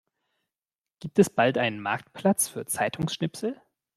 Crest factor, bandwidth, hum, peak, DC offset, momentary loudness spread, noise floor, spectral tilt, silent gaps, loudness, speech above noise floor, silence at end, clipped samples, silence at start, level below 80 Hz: 22 dB; 14.5 kHz; none; -6 dBFS; under 0.1%; 11 LU; under -90 dBFS; -4.5 dB/octave; none; -26 LUFS; over 64 dB; 0.4 s; under 0.1%; 1 s; -64 dBFS